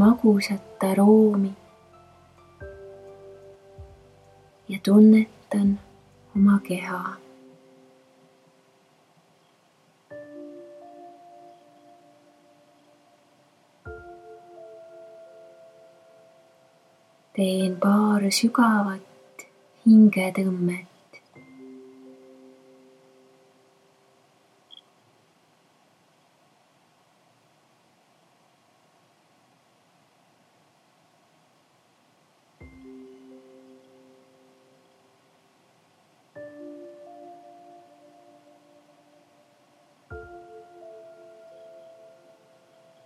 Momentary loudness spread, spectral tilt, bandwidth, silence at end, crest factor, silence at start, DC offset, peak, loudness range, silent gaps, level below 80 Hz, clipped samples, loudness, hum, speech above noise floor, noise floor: 31 LU; -6.5 dB/octave; 13.5 kHz; 2.7 s; 22 dB; 0 s; under 0.1%; -6 dBFS; 26 LU; none; -62 dBFS; under 0.1%; -21 LUFS; none; 43 dB; -62 dBFS